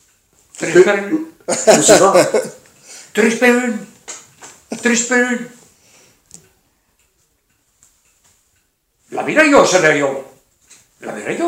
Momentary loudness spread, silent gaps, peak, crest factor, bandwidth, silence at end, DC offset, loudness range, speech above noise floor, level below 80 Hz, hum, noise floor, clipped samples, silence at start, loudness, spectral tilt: 21 LU; none; 0 dBFS; 16 dB; 16.5 kHz; 0 s; under 0.1%; 8 LU; 50 dB; -58 dBFS; none; -63 dBFS; under 0.1%; 0.6 s; -13 LUFS; -3 dB/octave